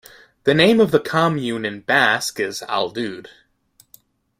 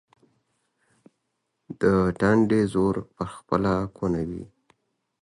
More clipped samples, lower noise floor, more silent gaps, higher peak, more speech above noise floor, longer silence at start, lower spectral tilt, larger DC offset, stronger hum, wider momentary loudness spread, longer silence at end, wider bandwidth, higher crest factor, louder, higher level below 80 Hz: neither; second, -57 dBFS vs -78 dBFS; neither; first, 0 dBFS vs -8 dBFS; second, 39 dB vs 55 dB; second, 0.45 s vs 1.7 s; second, -4.5 dB/octave vs -8 dB/octave; neither; neither; about the same, 12 LU vs 14 LU; first, 1.2 s vs 0.75 s; first, 16 kHz vs 11.5 kHz; about the same, 20 dB vs 18 dB; first, -18 LUFS vs -24 LUFS; second, -58 dBFS vs -48 dBFS